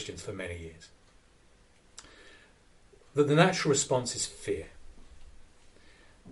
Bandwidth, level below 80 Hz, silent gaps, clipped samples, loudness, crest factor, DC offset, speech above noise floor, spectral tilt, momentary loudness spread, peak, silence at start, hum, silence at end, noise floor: 11.5 kHz; -56 dBFS; none; under 0.1%; -29 LUFS; 26 dB; under 0.1%; 32 dB; -4 dB/octave; 27 LU; -8 dBFS; 0 s; none; 0 s; -61 dBFS